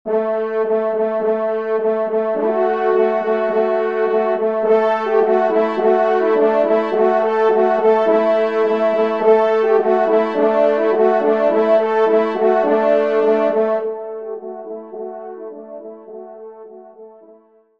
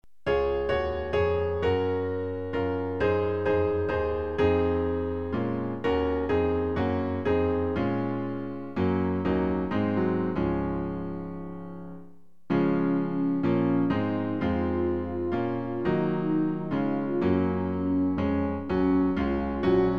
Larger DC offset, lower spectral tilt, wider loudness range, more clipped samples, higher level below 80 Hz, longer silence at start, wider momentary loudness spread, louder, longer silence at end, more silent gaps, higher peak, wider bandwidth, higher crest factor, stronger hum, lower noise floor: about the same, 0.3% vs 0.5%; second, -7 dB/octave vs -9.5 dB/octave; first, 7 LU vs 2 LU; neither; second, -68 dBFS vs -44 dBFS; second, 0.05 s vs 0.25 s; first, 15 LU vs 6 LU; first, -16 LUFS vs -27 LUFS; first, 0.7 s vs 0 s; neither; first, -2 dBFS vs -12 dBFS; about the same, 6 kHz vs 6.2 kHz; about the same, 16 dB vs 14 dB; neither; second, -49 dBFS vs -53 dBFS